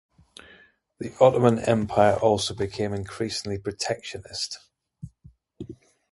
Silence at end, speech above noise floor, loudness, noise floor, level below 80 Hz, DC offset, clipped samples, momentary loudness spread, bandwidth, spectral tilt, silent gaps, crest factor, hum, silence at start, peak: 0.35 s; 32 dB; -24 LUFS; -56 dBFS; -52 dBFS; under 0.1%; under 0.1%; 23 LU; 11.5 kHz; -5 dB/octave; none; 22 dB; none; 1 s; -2 dBFS